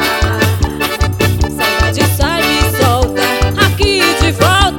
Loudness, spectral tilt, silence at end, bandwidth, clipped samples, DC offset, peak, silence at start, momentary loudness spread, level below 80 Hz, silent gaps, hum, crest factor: -12 LUFS; -4.5 dB/octave; 0 s; 19 kHz; under 0.1%; under 0.1%; 0 dBFS; 0 s; 4 LU; -20 dBFS; none; none; 12 dB